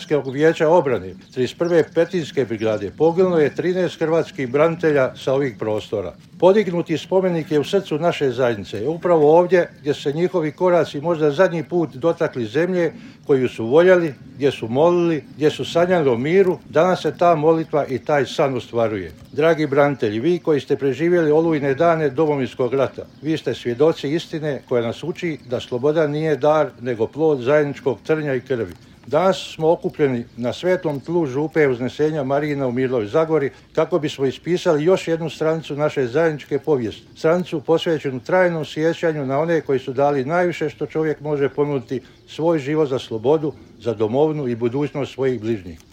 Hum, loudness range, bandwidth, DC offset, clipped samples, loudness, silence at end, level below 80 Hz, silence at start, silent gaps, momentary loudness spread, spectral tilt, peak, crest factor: none; 3 LU; 10.5 kHz; under 0.1%; under 0.1%; -20 LUFS; 0.15 s; -58 dBFS; 0 s; none; 8 LU; -7 dB/octave; -2 dBFS; 18 dB